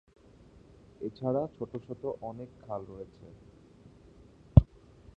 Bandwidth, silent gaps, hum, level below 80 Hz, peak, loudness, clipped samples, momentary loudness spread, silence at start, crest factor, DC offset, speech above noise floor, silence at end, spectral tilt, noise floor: 4.6 kHz; none; none; -40 dBFS; -2 dBFS; -31 LUFS; under 0.1%; 23 LU; 1 s; 30 dB; under 0.1%; 20 dB; 0.5 s; -11.5 dB/octave; -57 dBFS